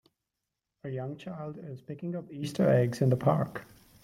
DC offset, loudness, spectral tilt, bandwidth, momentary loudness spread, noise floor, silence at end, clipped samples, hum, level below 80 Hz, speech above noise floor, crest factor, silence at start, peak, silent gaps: under 0.1%; -30 LUFS; -8 dB/octave; 14 kHz; 17 LU; -86 dBFS; 0.4 s; under 0.1%; none; -66 dBFS; 57 dB; 20 dB; 0.85 s; -10 dBFS; none